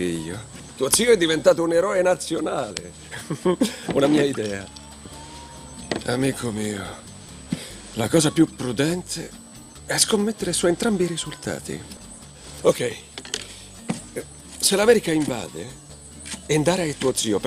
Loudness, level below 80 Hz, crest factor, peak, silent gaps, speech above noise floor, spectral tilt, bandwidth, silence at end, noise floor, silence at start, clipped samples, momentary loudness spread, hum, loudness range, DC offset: -22 LUFS; -50 dBFS; 22 dB; -2 dBFS; none; 20 dB; -4 dB/octave; 15.5 kHz; 0 s; -42 dBFS; 0 s; under 0.1%; 21 LU; none; 7 LU; under 0.1%